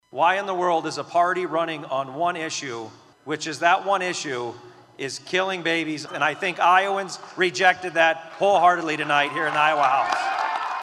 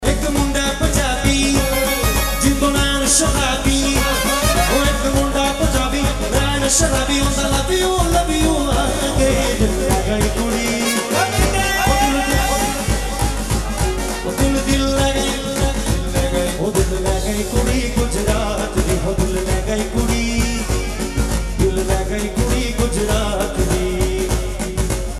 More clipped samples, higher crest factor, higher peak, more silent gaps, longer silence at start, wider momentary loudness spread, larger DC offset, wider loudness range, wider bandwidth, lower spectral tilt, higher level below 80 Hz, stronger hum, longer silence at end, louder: neither; about the same, 20 dB vs 16 dB; second, -4 dBFS vs 0 dBFS; neither; first, 0.15 s vs 0 s; first, 11 LU vs 5 LU; neither; about the same, 5 LU vs 4 LU; second, 12 kHz vs 14.5 kHz; about the same, -3 dB/octave vs -4 dB/octave; second, -76 dBFS vs -22 dBFS; neither; about the same, 0 s vs 0 s; second, -22 LUFS vs -18 LUFS